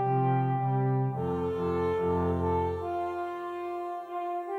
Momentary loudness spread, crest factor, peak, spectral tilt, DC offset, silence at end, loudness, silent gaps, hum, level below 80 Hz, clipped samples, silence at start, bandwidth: 8 LU; 12 dB; -16 dBFS; -9.5 dB/octave; under 0.1%; 0 s; -30 LUFS; none; none; -52 dBFS; under 0.1%; 0 s; 4.5 kHz